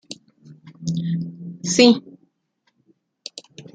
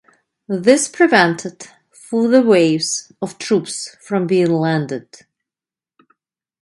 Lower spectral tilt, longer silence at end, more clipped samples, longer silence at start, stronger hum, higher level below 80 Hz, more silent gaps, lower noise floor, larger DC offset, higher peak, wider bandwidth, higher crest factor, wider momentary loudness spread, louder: about the same, -4.5 dB/octave vs -4.5 dB/octave; second, 0.15 s vs 1.6 s; neither; second, 0.1 s vs 0.5 s; neither; about the same, -66 dBFS vs -66 dBFS; neither; second, -70 dBFS vs under -90 dBFS; neither; about the same, -2 dBFS vs 0 dBFS; second, 9.4 kHz vs 11.5 kHz; about the same, 22 dB vs 18 dB; first, 25 LU vs 15 LU; second, -19 LUFS vs -16 LUFS